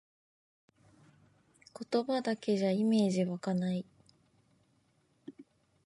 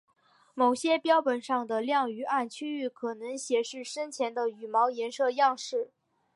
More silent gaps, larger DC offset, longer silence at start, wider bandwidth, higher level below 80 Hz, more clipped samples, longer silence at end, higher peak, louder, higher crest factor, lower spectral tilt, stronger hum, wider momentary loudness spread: neither; neither; first, 1.8 s vs 0.55 s; about the same, 11.5 kHz vs 11.5 kHz; about the same, -80 dBFS vs -84 dBFS; neither; about the same, 0.45 s vs 0.5 s; second, -18 dBFS vs -12 dBFS; second, -32 LUFS vs -29 LUFS; about the same, 18 dB vs 18 dB; first, -6.5 dB/octave vs -2.5 dB/octave; neither; first, 24 LU vs 11 LU